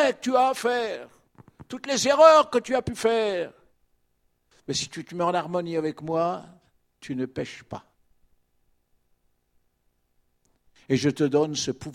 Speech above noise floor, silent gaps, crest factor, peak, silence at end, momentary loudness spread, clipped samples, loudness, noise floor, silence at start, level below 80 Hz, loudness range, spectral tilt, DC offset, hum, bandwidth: 47 dB; none; 24 dB; -4 dBFS; 0 s; 19 LU; under 0.1%; -24 LUFS; -71 dBFS; 0 s; -60 dBFS; 17 LU; -4.5 dB/octave; under 0.1%; none; 14.5 kHz